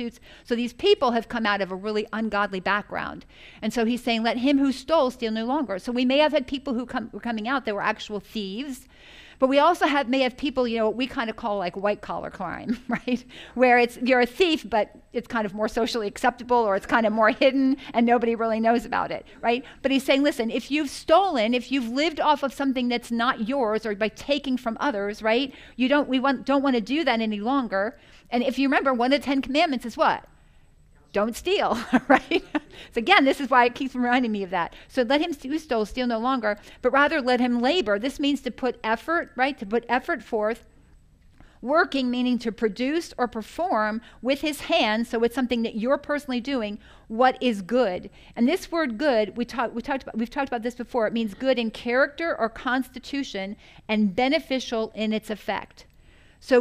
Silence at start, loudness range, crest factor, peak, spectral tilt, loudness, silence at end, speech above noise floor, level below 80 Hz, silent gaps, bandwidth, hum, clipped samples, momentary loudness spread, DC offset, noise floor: 0 s; 4 LU; 22 dB; -2 dBFS; -4.5 dB/octave; -24 LUFS; 0 s; 31 dB; -52 dBFS; none; 15 kHz; none; under 0.1%; 10 LU; under 0.1%; -55 dBFS